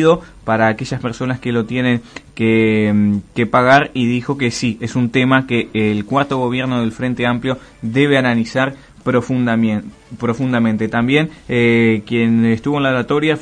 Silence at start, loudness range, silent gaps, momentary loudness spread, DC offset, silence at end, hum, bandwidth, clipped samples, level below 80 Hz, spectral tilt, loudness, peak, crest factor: 0 s; 2 LU; none; 8 LU; under 0.1%; 0 s; none; 10 kHz; under 0.1%; -46 dBFS; -6.5 dB/octave; -16 LUFS; 0 dBFS; 16 dB